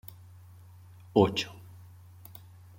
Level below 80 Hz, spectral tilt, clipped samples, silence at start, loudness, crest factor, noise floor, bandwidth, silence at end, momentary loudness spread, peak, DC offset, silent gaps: -64 dBFS; -6 dB/octave; under 0.1%; 1.15 s; -28 LUFS; 26 dB; -52 dBFS; 16.5 kHz; 1.25 s; 27 LU; -8 dBFS; under 0.1%; none